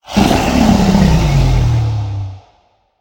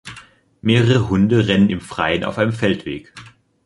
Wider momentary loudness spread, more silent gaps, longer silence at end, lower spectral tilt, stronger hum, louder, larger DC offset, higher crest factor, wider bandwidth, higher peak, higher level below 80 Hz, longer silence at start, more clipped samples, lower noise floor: about the same, 11 LU vs 12 LU; neither; first, 0.6 s vs 0.4 s; about the same, -6.5 dB/octave vs -7 dB/octave; neither; first, -12 LUFS vs -17 LUFS; neither; about the same, 12 dB vs 16 dB; first, 17.5 kHz vs 11.5 kHz; about the same, 0 dBFS vs -2 dBFS; first, -20 dBFS vs -44 dBFS; about the same, 0.1 s vs 0.05 s; neither; first, -55 dBFS vs -45 dBFS